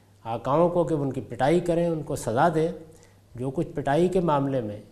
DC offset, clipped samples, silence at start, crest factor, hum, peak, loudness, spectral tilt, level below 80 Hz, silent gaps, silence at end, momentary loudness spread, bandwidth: under 0.1%; under 0.1%; 0.25 s; 16 dB; none; -8 dBFS; -25 LUFS; -7 dB/octave; -50 dBFS; none; 0.05 s; 9 LU; 14 kHz